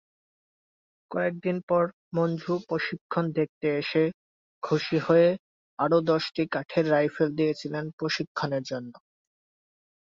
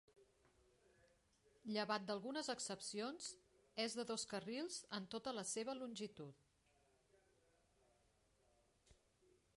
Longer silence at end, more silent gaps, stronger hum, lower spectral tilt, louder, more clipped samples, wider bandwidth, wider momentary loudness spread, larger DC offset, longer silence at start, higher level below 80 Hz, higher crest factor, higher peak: first, 1.15 s vs 0.65 s; first, 1.63-1.68 s, 1.93-2.11 s, 3.01-3.09 s, 3.49-3.61 s, 4.14-4.61 s, 5.39-5.77 s, 7.93-7.98 s, 8.27-8.35 s vs none; neither; first, -7 dB/octave vs -3 dB/octave; first, -27 LUFS vs -47 LUFS; neither; second, 7.6 kHz vs 11.5 kHz; about the same, 10 LU vs 10 LU; neither; first, 1.1 s vs 0.15 s; first, -70 dBFS vs -84 dBFS; about the same, 18 dB vs 22 dB; first, -10 dBFS vs -28 dBFS